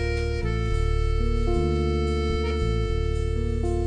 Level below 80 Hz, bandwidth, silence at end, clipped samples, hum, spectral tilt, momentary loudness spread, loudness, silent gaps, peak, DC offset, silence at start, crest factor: -26 dBFS; 9.8 kHz; 0 s; under 0.1%; none; -7 dB/octave; 3 LU; -26 LUFS; none; -12 dBFS; under 0.1%; 0 s; 12 dB